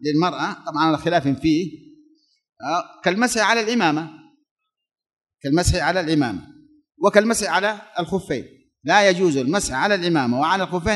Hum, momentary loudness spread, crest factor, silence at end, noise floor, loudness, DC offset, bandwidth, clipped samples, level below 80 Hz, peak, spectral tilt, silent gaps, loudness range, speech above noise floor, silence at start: none; 11 LU; 20 dB; 0 s; -58 dBFS; -20 LUFS; under 0.1%; 12 kHz; under 0.1%; -42 dBFS; 0 dBFS; -4.5 dB/octave; 4.51-4.56 s, 5.13-5.17 s; 3 LU; 38 dB; 0 s